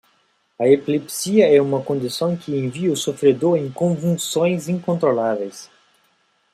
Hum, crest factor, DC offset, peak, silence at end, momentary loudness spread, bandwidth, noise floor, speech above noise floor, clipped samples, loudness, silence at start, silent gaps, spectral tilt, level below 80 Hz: none; 18 dB; under 0.1%; -2 dBFS; 0.9 s; 8 LU; 15 kHz; -63 dBFS; 44 dB; under 0.1%; -19 LUFS; 0.6 s; none; -5.5 dB/octave; -64 dBFS